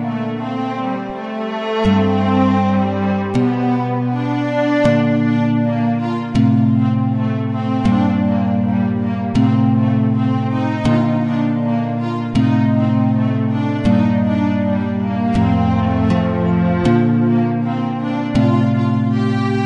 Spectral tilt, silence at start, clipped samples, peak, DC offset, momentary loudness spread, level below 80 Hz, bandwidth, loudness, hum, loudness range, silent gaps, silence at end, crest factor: -8.5 dB/octave; 0 s; under 0.1%; -2 dBFS; under 0.1%; 6 LU; -42 dBFS; 8 kHz; -17 LUFS; none; 1 LU; none; 0 s; 14 dB